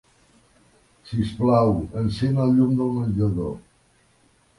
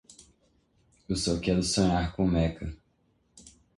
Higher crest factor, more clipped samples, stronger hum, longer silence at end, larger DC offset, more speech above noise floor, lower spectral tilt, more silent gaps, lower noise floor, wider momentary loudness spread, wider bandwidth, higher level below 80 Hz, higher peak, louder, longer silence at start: about the same, 18 dB vs 18 dB; neither; neither; first, 1 s vs 0.3 s; neither; about the same, 40 dB vs 43 dB; first, -9 dB/octave vs -5 dB/octave; neither; second, -60 dBFS vs -70 dBFS; about the same, 11 LU vs 10 LU; about the same, 11.5 kHz vs 11.5 kHz; about the same, -44 dBFS vs -42 dBFS; first, -6 dBFS vs -12 dBFS; first, -22 LUFS vs -27 LUFS; about the same, 1.05 s vs 1.1 s